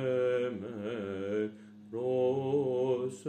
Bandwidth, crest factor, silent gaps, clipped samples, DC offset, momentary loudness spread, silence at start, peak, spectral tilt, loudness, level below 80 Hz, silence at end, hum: 9.4 kHz; 12 dB; none; under 0.1%; under 0.1%; 9 LU; 0 s; -20 dBFS; -7 dB/octave; -33 LUFS; -82 dBFS; 0 s; none